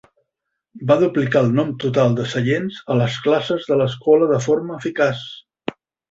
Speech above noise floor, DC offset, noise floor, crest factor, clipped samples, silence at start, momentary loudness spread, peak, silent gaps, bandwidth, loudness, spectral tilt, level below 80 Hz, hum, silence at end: 61 dB; under 0.1%; -79 dBFS; 18 dB; under 0.1%; 0.75 s; 14 LU; -2 dBFS; none; 7.8 kHz; -18 LUFS; -6.5 dB/octave; -58 dBFS; none; 0.4 s